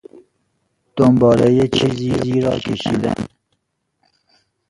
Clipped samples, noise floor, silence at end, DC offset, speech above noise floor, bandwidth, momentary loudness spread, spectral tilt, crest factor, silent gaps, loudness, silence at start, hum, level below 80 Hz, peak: under 0.1%; -71 dBFS; 1.45 s; under 0.1%; 56 dB; 11.5 kHz; 12 LU; -7 dB/octave; 18 dB; none; -16 LUFS; 0.95 s; none; -46 dBFS; 0 dBFS